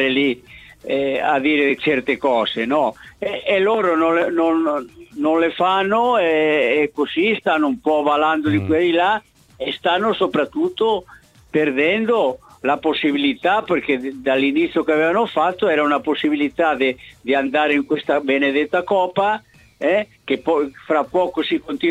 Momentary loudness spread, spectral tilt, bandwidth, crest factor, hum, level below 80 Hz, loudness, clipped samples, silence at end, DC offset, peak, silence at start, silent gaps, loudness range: 6 LU; -6 dB/octave; 10 kHz; 14 dB; none; -56 dBFS; -19 LUFS; under 0.1%; 0 s; under 0.1%; -4 dBFS; 0 s; none; 2 LU